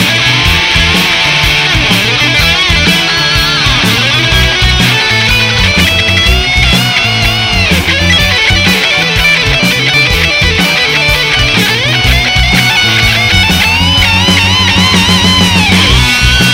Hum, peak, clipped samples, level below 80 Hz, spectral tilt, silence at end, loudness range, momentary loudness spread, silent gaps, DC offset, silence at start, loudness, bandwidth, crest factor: none; 0 dBFS; 0.4%; -18 dBFS; -3 dB/octave; 0 s; 1 LU; 2 LU; none; under 0.1%; 0 s; -6 LUFS; 16.5 kHz; 8 dB